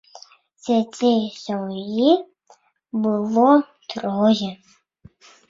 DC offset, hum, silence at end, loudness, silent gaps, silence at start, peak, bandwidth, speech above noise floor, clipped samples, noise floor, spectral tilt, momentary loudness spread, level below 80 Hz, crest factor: under 0.1%; none; 0.95 s; -20 LUFS; none; 0.65 s; -2 dBFS; 7.6 kHz; 37 dB; under 0.1%; -56 dBFS; -6 dB/octave; 13 LU; -66 dBFS; 18 dB